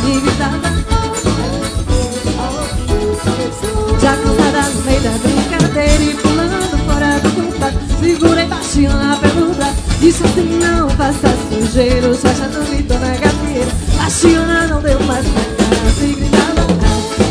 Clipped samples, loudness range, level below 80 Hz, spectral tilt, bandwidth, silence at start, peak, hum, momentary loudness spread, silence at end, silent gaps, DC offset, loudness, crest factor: under 0.1%; 3 LU; -20 dBFS; -5 dB/octave; 11 kHz; 0 s; 0 dBFS; none; 5 LU; 0 s; none; under 0.1%; -14 LUFS; 12 dB